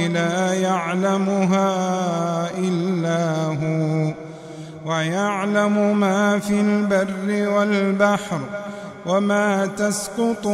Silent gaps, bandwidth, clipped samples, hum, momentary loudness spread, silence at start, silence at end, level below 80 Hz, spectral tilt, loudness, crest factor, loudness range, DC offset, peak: none; 14 kHz; under 0.1%; none; 9 LU; 0 s; 0 s; -62 dBFS; -6 dB/octave; -20 LUFS; 16 dB; 3 LU; under 0.1%; -4 dBFS